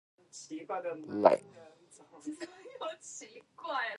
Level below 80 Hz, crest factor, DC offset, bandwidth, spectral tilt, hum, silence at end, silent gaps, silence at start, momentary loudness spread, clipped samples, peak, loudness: -82 dBFS; 30 dB; under 0.1%; 11.5 kHz; -4 dB/octave; none; 0 s; none; 0.35 s; 21 LU; under 0.1%; -6 dBFS; -34 LUFS